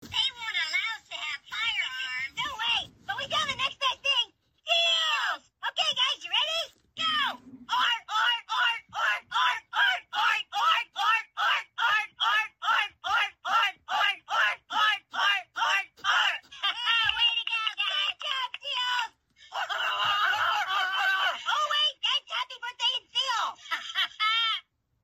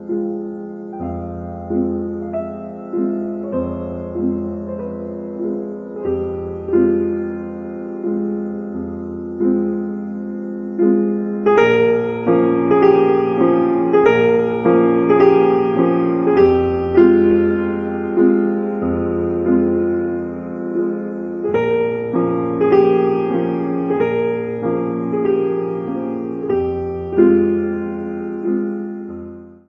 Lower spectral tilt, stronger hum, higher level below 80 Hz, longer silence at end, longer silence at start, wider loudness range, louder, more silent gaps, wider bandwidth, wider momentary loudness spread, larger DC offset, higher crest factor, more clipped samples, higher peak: second, 1 dB/octave vs -9.5 dB/octave; neither; second, -70 dBFS vs -42 dBFS; first, 0.45 s vs 0.15 s; about the same, 0 s vs 0 s; second, 2 LU vs 10 LU; second, -27 LUFS vs -18 LUFS; neither; first, 16 kHz vs 6.2 kHz; second, 7 LU vs 13 LU; neither; about the same, 18 dB vs 16 dB; neither; second, -10 dBFS vs 0 dBFS